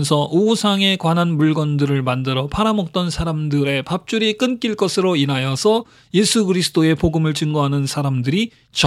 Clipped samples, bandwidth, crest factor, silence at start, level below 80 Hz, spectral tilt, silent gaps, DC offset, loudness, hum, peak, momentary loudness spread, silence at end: under 0.1%; 14.5 kHz; 18 dB; 0 s; -42 dBFS; -5.5 dB/octave; none; under 0.1%; -18 LUFS; none; 0 dBFS; 5 LU; 0 s